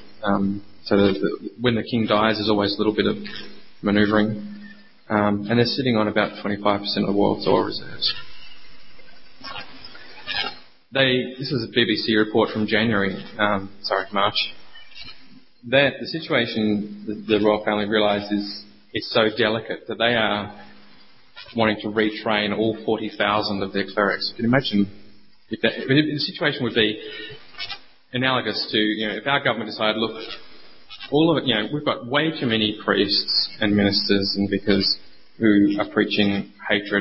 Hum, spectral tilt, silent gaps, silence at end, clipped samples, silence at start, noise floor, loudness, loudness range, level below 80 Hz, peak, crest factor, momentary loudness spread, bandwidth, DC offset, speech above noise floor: none; -9 dB/octave; none; 0 s; under 0.1%; 0 s; -53 dBFS; -22 LUFS; 4 LU; -54 dBFS; -4 dBFS; 20 dB; 14 LU; 5.8 kHz; 0.4%; 32 dB